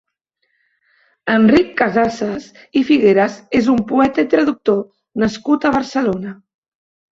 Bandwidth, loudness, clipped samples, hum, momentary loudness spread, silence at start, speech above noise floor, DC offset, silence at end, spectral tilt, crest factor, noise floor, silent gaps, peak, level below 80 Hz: 7.6 kHz; -16 LUFS; under 0.1%; none; 12 LU; 1.25 s; 55 dB; under 0.1%; 0.8 s; -6.5 dB/octave; 16 dB; -70 dBFS; none; -2 dBFS; -50 dBFS